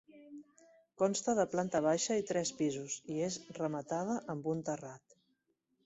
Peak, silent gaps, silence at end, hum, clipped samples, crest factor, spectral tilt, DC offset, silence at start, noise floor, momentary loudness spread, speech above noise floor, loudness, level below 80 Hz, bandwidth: -18 dBFS; none; 0.9 s; none; under 0.1%; 18 dB; -4.5 dB/octave; under 0.1%; 0.15 s; -80 dBFS; 15 LU; 45 dB; -36 LUFS; -76 dBFS; 8.2 kHz